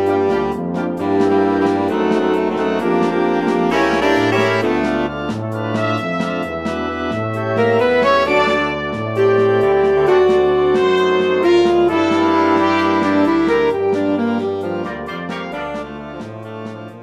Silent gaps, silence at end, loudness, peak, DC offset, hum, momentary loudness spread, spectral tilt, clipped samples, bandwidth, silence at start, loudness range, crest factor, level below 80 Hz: none; 0 s; -16 LUFS; -2 dBFS; under 0.1%; none; 11 LU; -6.5 dB/octave; under 0.1%; 11 kHz; 0 s; 5 LU; 14 dB; -46 dBFS